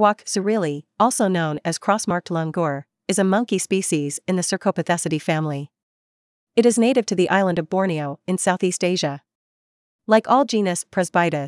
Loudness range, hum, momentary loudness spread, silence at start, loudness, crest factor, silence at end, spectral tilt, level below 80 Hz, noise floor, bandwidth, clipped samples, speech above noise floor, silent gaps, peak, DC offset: 2 LU; none; 7 LU; 0 s; -21 LUFS; 18 dB; 0 s; -4.5 dB/octave; -70 dBFS; under -90 dBFS; 12 kHz; under 0.1%; over 70 dB; 5.83-6.47 s, 9.35-9.99 s; -2 dBFS; under 0.1%